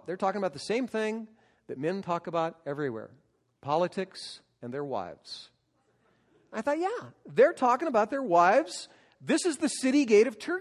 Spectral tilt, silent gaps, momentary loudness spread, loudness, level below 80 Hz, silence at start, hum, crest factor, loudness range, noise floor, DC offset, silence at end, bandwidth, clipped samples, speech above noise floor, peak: -4.5 dB/octave; none; 20 LU; -28 LUFS; -76 dBFS; 0.05 s; none; 18 dB; 10 LU; -71 dBFS; under 0.1%; 0 s; 12.5 kHz; under 0.1%; 43 dB; -10 dBFS